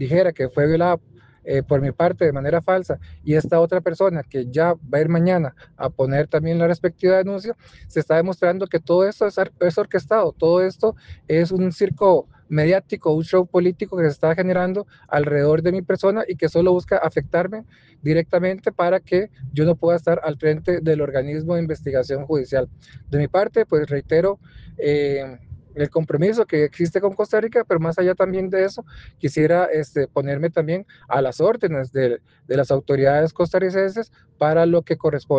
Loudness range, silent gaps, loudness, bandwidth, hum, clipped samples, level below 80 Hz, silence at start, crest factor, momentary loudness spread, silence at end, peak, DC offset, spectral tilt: 2 LU; none; -20 LUFS; 8.2 kHz; none; under 0.1%; -50 dBFS; 0 s; 16 dB; 8 LU; 0 s; -4 dBFS; under 0.1%; -8.5 dB/octave